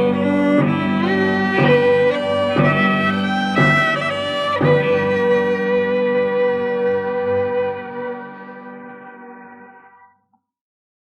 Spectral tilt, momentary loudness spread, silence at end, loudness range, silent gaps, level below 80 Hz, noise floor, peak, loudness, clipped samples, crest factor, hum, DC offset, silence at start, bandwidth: -7 dB/octave; 20 LU; 1.35 s; 10 LU; none; -56 dBFS; -63 dBFS; -4 dBFS; -17 LUFS; under 0.1%; 14 dB; none; under 0.1%; 0 s; 9.8 kHz